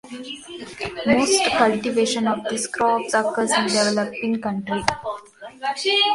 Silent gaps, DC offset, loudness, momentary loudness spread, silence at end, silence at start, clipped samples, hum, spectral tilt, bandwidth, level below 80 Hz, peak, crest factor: none; under 0.1%; -21 LUFS; 16 LU; 0 s; 0.05 s; under 0.1%; none; -3 dB/octave; 11.5 kHz; -54 dBFS; 0 dBFS; 22 dB